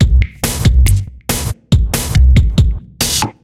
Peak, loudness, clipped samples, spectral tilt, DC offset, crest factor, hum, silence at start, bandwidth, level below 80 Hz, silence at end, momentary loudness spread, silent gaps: 0 dBFS; -14 LUFS; under 0.1%; -4.5 dB/octave; under 0.1%; 12 dB; none; 0 s; 16.5 kHz; -14 dBFS; 0.15 s; 8 LU; none